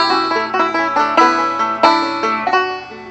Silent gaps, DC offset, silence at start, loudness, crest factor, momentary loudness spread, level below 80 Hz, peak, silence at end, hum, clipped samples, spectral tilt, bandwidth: none; under 0.1%; 0 s; -15 LUFS; 16 dB; 5 LU; -58 dBFS; 0 dBFS; 0 s; none; under 0.1%; -3 dB/octave; 8.4 kHz